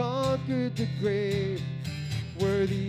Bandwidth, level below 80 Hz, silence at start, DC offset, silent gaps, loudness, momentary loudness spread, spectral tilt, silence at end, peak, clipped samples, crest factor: 15 kHz; -56 dBFS; 0 s; under 0.1%; none; -29 LUFS; 7 LU; -7 dB/octave; 0 s; -14 dBFS; under 0.1%; 14 dB